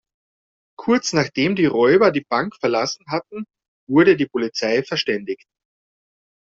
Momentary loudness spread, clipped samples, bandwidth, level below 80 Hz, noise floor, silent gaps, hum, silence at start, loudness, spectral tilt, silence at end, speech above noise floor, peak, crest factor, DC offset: 15 LU; under 0.1%; 7.8 kHz; -60 dBFS; under -90 dBFS; 3.68-3.87 s; none; 0.8 s; -19 LUFS; -4 dB/octave; 1.15 s; over 71 dB; -2 dBFS; 18 dB; under 0.1%